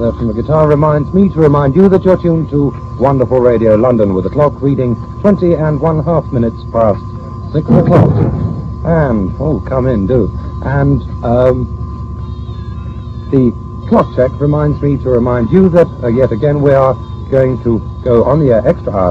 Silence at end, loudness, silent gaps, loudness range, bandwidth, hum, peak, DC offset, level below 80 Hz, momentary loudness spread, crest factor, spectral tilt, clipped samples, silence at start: 0 s; -12 LUFS; none; 5 LU; 7 kHz; none; 0 dBFS; under 0.1%; -26 dBFS; 11 LU; 10 dB; -10.5 dB/octave; 0.3%; 0 s